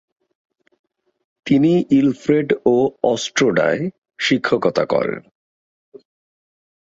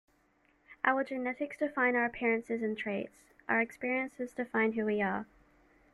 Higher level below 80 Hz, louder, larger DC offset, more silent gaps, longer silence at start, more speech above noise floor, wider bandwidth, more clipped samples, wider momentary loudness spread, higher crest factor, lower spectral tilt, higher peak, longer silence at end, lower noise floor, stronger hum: first, -58 dBFS vs -70 dBFS; first, -18 LUFS vs -33 LUFS; neither; first, 3.98-4.02 s vs none; first, 1.45 s vs 0.7 s; first, over 73 dB vs 37 dB; second, 7.8 kHz vs 12 kHz; neither; about the same, 9 LU vs 9 LU; about the same, 18 dB vs 22 dB; about the same, -5.5 dB/octave vs -6.5 dB/octave; first, -2 dBFS vs -12 dBFS; first, 1.65 s vs 0.7 s; first, under -90 dBFS vs -70 dBFS; neither